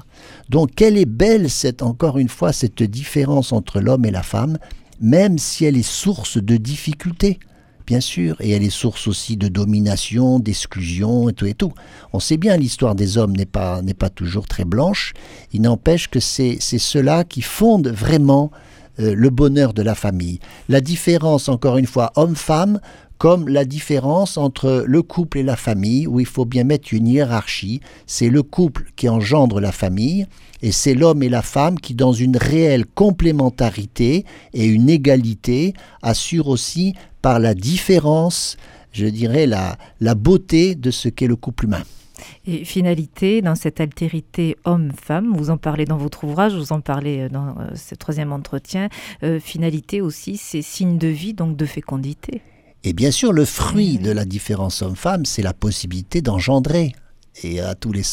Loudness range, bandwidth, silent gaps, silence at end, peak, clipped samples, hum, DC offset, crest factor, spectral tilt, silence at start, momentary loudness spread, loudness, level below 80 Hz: 5 LU; 17 kHz; none; 0 s; 0 dBFS; under 0.1%; none; under 0.1%; 16 dB; -6 dB/octave; 0.25 s; 10 LU; -18 LUFS; -36 dBFS